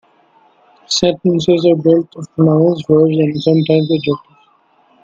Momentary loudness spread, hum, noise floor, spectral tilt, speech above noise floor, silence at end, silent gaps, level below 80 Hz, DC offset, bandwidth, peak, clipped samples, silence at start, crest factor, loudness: 6 LU; none; -53 dBFS; -6.5 dB/octave; 41 dB; 0.85 s; none; -52 dBFS; under 0.1%; 7.8 kHz; 0 dBFS; under 0.1%; 0.9 s; 14 dB; -13 LUFS